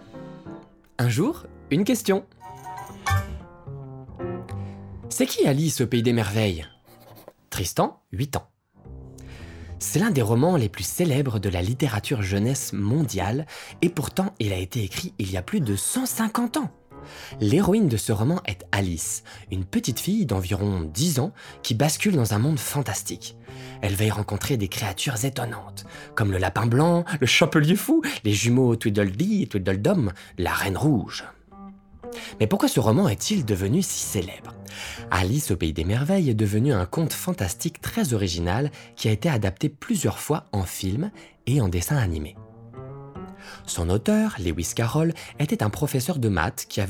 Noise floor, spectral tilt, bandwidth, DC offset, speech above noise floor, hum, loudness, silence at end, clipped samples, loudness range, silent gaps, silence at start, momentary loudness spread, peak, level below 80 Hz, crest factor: -49 dBFS; -5 dB/octave; 19.5 kHz; under 0.1%; 26 dB; none; -24 LUFS; 0 s; under 0.1%; 5 LU; none; 0 s; 18 LU; -2 dBFS; -50 dBFS; 22 dB